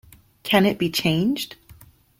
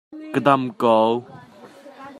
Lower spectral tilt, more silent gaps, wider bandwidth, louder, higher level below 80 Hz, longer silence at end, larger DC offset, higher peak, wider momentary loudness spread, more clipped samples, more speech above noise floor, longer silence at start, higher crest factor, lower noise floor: second, -5 dB/octave vs -7 dB/octave; neither; first, 16.5 kHz vs 12.5 kHz; about the same, -21 LUFS vs -19 LUFS; first, -54 dBFS vs -70 dBFS; first, 0.45 s vs 0 s; neither; about the same, -4 dBFS vs -2 dBFS; first, 13 LU vs 9 LU; neither; about the same, 29 dB vs 26 dB; first, 0.45 s vs 0.1 s; about the same, 20 dB vs 20 dB; first, -50 dBFS vs -44 dBFS